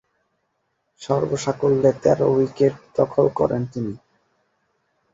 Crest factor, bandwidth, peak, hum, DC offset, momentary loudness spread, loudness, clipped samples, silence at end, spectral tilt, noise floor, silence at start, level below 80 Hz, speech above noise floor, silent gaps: 20 dB; 8 kHz; -2 dBFS; none; under 0.1%; 12 LU; -21 LUFS; under 0.1%; 1.15 s; -7 dB/octave; -72 dBFS; 1 s; -54 dBFS; 53 dB; none